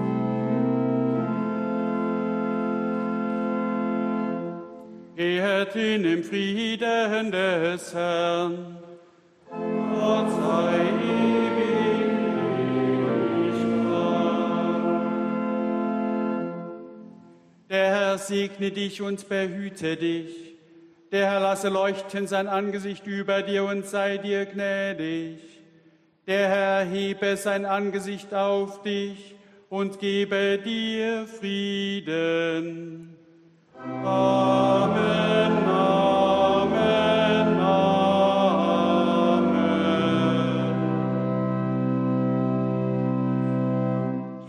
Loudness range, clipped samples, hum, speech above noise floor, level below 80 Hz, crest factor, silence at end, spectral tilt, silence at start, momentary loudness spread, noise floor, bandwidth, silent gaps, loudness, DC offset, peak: 7 LU; under 0.1%; none; 34 dB; -66 dBFS; 16 dB; 0 s; -6.5 dB/octave; 0 s; 10 LU; -59 dBFS; 13.5 kHz; none; -24 LUFS; under 0.1%; -8 dBFS